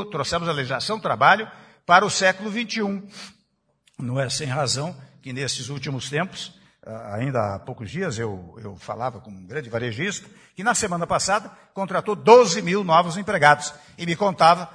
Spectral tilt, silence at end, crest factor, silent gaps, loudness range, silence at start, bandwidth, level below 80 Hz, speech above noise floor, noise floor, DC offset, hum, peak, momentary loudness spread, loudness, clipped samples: -4 dB/octave; 0.05 s; 22 dB; none; 10 LU; 0 s; 10.5 kHz; -58 dBFS; 46 dB; -68 dBFS; under 0.1%; none; 0 dBFS; 19 LU; -21 LUFS; under 0.1%